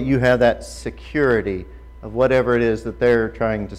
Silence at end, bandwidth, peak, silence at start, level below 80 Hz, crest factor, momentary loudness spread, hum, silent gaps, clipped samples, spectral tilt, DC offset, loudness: 0 s; 12.5 kHz; -6 dBFS; 0 s; -38 dBFS; 14 dB; 14 LU; none; none; under 0.1%; -7 dB/octave; under 0.1%; -19 LUFS